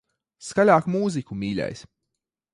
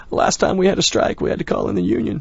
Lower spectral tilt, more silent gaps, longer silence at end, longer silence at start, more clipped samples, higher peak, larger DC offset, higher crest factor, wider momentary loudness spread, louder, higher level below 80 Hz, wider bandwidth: first, -6 dB/octave vs -4.5 dB/octave; neither; first, 0.75 s vs 0 s; first, 0.4 s vs 0 s; neither; about the same, -4 dBFS vs -2 dBFS; neither; about the same, 20 dB vs 16 dB; first, 17 LU vs 5 LU; second, -23 LUFS vs -18 LUFS; second, -58 dBFS vs -40 dBFS; first, 11 kHz vs 8 kHz